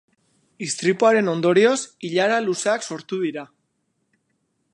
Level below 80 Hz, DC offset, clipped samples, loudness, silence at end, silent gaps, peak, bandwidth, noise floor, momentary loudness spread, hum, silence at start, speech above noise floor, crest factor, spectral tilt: -76 dBFS; under 0.1%; under 0.1%; -20 LUFS; 1.3 s; none; -4 dBFS; 11.5 kHz; -72 dBFS; 11 LU; none; 0.6 s; 52 dB; 18 dB; -4 dB/octave